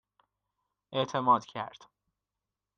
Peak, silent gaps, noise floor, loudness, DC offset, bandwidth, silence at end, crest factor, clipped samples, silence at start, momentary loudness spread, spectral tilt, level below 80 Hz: -14 dBFS; none; -89 dBFS; -30 LUFS; under 0.1%; 7.4 kHz; 1.1 s; 22 dB; under 0.1%; 0.9 s; 14 LU; -5.5 dB/octave; -78 dBFS